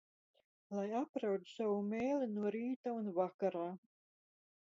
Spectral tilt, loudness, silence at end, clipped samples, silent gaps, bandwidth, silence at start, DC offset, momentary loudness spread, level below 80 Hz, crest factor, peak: -6.5 dB/octave; -40 LUFS; 0.95 s; under 0.1%; 1.09-1.14 s, 2.76-2.84 s, 3.34-3.39 s; 7.4 kHz; 0.7 s; under 0.1%; 6 LU; -84 dBFS; 18 dB; -24 dBFS